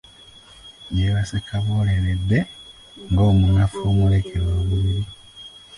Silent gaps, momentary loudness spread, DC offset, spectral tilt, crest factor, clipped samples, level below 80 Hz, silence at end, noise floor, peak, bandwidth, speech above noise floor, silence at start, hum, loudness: none; 22 LU; under 0.1%; -7.5 dB/octave; 12 dB; under 0.1%; -30 dBFS; 0.3 s; -46 dBFS; -8 dBFS; 11 kHz; 28 dB; 0.65 s; none; -20 LUFS